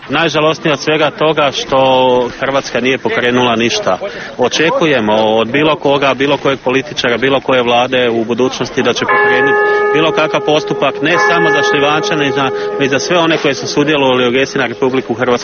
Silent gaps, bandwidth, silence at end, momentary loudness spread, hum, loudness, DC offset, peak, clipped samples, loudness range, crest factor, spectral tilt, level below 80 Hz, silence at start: none; 6.8 kHz; 0 s; 5 LU; none; -12 LUFS; under 0.1%; 0 dBFS; under 0.1%; 2 LU; 12 dB; -2.5 dB/octave; -48 dBFS; 0 s